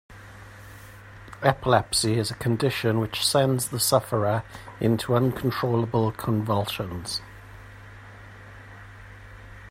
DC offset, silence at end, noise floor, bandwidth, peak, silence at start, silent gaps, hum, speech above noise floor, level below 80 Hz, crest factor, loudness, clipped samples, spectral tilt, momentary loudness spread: under 0.1%; 0 s; -45 dBFS; 16 kHz; -4 dBFS; 0.1 s; none; none; 21 dB; -52 dBFS; 22 dB; -24 LUFS; under 0.1%; -5 dB/octave; 23 LU